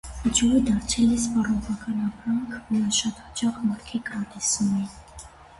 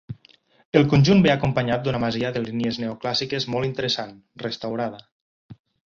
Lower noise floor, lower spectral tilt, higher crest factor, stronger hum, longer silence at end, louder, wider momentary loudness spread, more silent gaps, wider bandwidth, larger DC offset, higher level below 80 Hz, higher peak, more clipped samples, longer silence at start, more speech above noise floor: second, -45 dBFS vs -57 dBFS; second, -3.5 dB/octave vs -6.5 dB/octave; second, 16 dB vs 22 dB; neither; second, 0.05 s vs 0.35 s; second, -25 LUFS vs -22 LUFS; second, 10 LU vs 15 LU; second, none vs 0.65-0.72 s, 5.12-5.49 s; first, 11.5 kHz vs 7.4 kHz; neither; first, -44 dBFS vs -52 dBFS; second, -10 dBFS vs -2 dBFS; neither; about the same, 0.05 s vs 0.1 s; second, 21 dB vs 35 dB